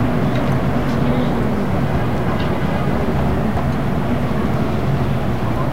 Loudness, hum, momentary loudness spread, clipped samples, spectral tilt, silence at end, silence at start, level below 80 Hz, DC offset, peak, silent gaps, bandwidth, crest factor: -19 LUFS; none; 2 LU; under 0.1%; -8 dB/octave; 0 s; 0 s; -28 dBFS; 7%; -6 dBFS; none; 16 kHz; 12 dB